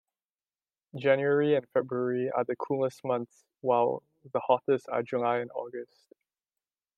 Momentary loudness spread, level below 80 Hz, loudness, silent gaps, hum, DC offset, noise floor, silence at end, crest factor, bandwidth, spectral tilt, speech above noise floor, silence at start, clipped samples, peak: 13 LU; -82 dBFS; -29 LUFS; none; none; under 0.1%; under -90 dBFS; 1.15 s; 20 dB; 9.8 kHz; -7.5 dB/octave; over 61 dB; 0.95 s; under 0.1%; -10 dBFS